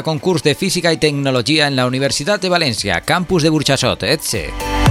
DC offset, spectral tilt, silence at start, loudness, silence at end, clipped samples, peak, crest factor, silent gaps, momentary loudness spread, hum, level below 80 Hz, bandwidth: under 0.1%; -4 dB/octave; 0 s; -15 LUFS; 0 s; under 0.1%; 0 dBFS; 16 dB; none; 4 LU; none; -32 dBFS; 16.5 kHz